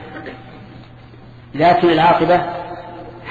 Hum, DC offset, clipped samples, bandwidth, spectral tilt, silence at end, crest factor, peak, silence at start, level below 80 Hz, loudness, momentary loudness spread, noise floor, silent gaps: none; under 0.1%; under 0.1%; 7.2 kHz; -7.5 dB/octave; 0 s; 16 dB; -2 dBFS; 0 s; -46 dBFS; -14 LUFS; 22 LU; -40 dBFS; none